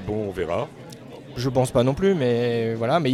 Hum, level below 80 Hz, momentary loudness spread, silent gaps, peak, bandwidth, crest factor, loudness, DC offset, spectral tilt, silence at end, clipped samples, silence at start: none; -48 dBFS; 18 LU; none; -8 dBFS; 14 kHz; 14 dB; -23 LUFS; under 0.1%; -6.5 dB/octave; 0 s; under 0.1%; 0 s